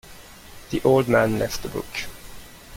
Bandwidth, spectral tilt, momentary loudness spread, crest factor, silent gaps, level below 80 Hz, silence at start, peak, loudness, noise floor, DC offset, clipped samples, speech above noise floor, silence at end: 17 kHz; -5.5 dB/octave; 25 LU; 20 dB; none; -44 dBFS; 0.05 s; -4 dBFS; -22 LUFS; -44 dBFS; under 0.1%; under 0.1%; 22 dB; 0 s